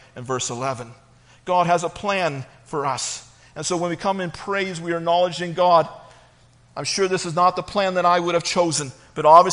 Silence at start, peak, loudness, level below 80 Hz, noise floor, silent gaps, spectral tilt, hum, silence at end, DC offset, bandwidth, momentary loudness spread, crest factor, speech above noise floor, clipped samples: 0.15 s; 0 dBFS; -21 LUFS; -58 dBFS; -53 dBFS; none; -4 dB/octave; none; 0 s; under 0.1%; 10.5 kHz; 13 LU; 20 dB; 33 dB; under 0.1%